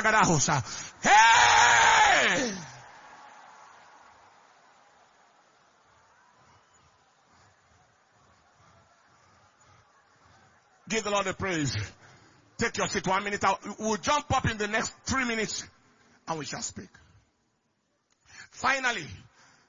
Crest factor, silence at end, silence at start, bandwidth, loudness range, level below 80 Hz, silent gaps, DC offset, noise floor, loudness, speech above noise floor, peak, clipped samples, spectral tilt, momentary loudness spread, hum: 22 dB; 0.55 s; 0 s; 7.6 kHz; 14 LU; -56 dBFS; none; under 0.1%; -75 dBFS; -25 LUFS; 48 dB; -6 dBFS; under 0.1%; -2.5 dB/octave; 19 LU; none